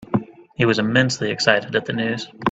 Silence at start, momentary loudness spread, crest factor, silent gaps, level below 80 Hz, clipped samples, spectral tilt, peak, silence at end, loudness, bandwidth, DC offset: 0 s; 8 LU; 20 dB; none; -56 dBFS; under 0.1%; -5 dB/octave; 0 dBFS; 0 s; -20 LUFS; 9 kHz; under 0.1%